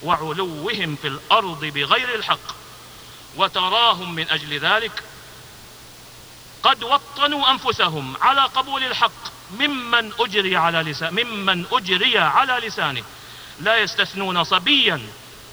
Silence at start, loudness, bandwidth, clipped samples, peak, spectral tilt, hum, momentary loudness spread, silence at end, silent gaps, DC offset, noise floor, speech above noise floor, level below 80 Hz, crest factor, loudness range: 0 s; -19 LUFS; over 20 kHz; under 0.1%; 0 dBFS; -3.5 dB/octave; none; 23 LU; 0 s; none; under 0.1%; -42 dBFS; 21 dB; -56 dBFS; 22 dB; 3 LU